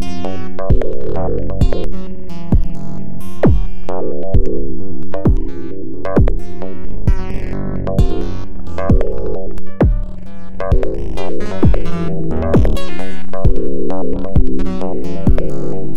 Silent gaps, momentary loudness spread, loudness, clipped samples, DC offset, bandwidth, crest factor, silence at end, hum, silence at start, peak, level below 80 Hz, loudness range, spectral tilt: none; 12 LU; -20 LUFS; under 0.1%; under 0.1%; 8.2 kHz; 10 dB; 0 s; none; 0 s; 0 dBFS; -20 dBFS; 2 LU; -8.5 dB/octave